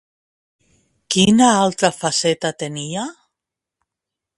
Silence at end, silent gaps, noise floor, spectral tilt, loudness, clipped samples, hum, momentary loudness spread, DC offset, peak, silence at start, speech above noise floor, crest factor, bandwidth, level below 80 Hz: 1.25 s; none; -84 dBFS; -4 dB/octave; -17 LUFS; under 0.1%; none; 14 LU; under 0.1%; 0 dBFS; 1.1 s; 67 dB; 20 dB; 11.5 kHz; -56 dBFS